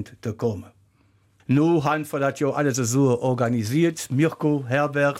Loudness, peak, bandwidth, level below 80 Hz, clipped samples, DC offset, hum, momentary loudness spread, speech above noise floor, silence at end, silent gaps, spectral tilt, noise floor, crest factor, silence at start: -22 LUFS; -8 dBFS; 16.5 kHz; -62 dBFS; under 0.1%; under 0.1%; none; 8 LU; 39 dB; 0 s; none; -6 dB/octave; -61 dBFS; 14 dB; 0 s